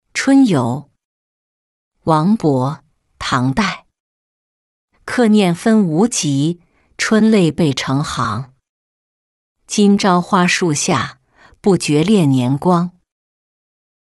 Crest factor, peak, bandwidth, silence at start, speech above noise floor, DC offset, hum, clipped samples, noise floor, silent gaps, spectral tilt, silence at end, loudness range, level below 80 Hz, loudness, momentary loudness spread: 14 dB; -2 dBFS; 12 kHz; 0.15 s; over 76 dB; under 0.1%; none; under 0.1%; under -90 dBFS; 1.05-1.91 s, 4.00-4.88 s, 8.69-9.55 s; -5.5 dB/octave; 1.15 s; 4 LU; -50 dBFS; -15 LUFS; 13 LU